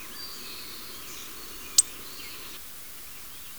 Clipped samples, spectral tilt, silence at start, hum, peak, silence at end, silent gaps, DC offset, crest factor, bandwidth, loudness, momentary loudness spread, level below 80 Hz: under 0.1%; 1 dB/octave; 0 s; none; -8 dBFS; 0 s; none; 0.5%; 26 dB; over 20 kHz; -31 LUFS; 17 LU; -60 dBFS